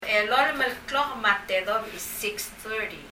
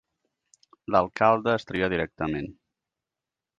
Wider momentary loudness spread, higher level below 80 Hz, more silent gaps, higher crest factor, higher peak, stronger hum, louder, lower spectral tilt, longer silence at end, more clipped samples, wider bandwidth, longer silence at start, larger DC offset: second, 9 LU vs 13 LU; about the same, -56 dBFS vs -54 dBFS; neither; about the same, 20 dB vs 22 dB; about the same, -8 dBFS vs -6 dBFS; neither; about the same, -26 LUFS vs -25 LUFS; second, -1.5 dB/octave vs -7 dB/octave; second, 0 s vs 1.05 s; neither; first, 16.5 kHz vs 7.6 kHz; second, 0 s vs 0.9 s; neither